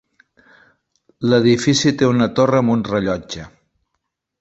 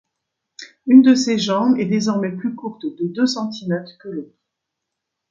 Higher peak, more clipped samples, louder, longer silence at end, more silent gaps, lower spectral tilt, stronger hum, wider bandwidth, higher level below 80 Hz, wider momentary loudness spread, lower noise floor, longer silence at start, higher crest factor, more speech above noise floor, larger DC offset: about the same, -2 dBFS vs 0 dBFS; neither; about the same, -16 LUFS vs -18 LUFS; about the same, 0.95 s vs 1.05 s; neither; about the same, -5.5 dB/octave vs -5.5 dB/octave; neither; about the same, 8 kHz vs 7.6 kHz; first, -50 dBFS vs -66 dBFS; second, 11 LU vs 20 LU; second, -75 dBFS vs -80 dBFS; first, 1.2 s vs 0.6 s; about the same, 18 dB vs 18 dB; second, 59 dB vs 63 dB; neither